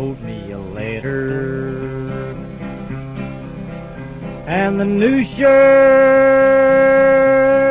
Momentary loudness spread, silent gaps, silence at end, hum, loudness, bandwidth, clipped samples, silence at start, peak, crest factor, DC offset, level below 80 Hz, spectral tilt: 20 LU; none; 0 s; none; -13 LUFS; 4 kHz; under 0.1%; 0 s; -2 dBFS; 12 dB; under 0.1%; -40 dBFS; -10.5 dB/octave